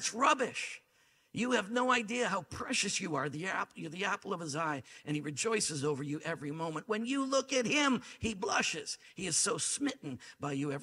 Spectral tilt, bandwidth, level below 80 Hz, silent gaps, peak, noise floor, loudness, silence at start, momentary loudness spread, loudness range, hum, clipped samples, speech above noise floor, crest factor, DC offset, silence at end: -3 dB/octave; 15 kHz; -68 dBFS; none; -14 dBFS; -70 dBFS; -34 LUFS; 0 s; 10 LU; 3 LU; none; under 0.1%; 35 dB; 20 dB; under 0.1%; 0 s